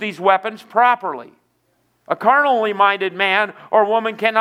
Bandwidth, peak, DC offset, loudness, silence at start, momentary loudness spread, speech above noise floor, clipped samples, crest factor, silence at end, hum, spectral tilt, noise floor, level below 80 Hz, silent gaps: 15 kHz; 0 dBFS; under 0.1%; -17 LUFS; 0 s; 7 LU; 47 dB; under 0.1%; 18 dB; 0 s; none; -5 dB/octave; -64 dBFS; -78 dBFS; none